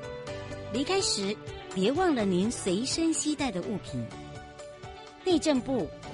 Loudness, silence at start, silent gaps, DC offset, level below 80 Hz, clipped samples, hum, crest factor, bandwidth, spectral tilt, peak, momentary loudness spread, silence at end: -29 LUFS; 0 s; none; under 0.1%; -54 dBFS; under 0.1%; none; 18 dB; 11.5 kHz; -4 dB/octave; -12 dBFS; 18 LU; 0 s